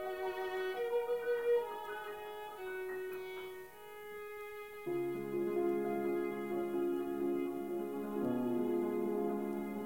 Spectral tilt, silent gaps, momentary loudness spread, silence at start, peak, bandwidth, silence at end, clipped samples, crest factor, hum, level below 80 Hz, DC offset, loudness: -6.5 dB/octave; none; 11 LU; 0 s; -24 dBFS; 16.5 kHz; 0 s; under 0.1%; 12 dB; none; -72 dBFS; under 0.1%; -38 LUFS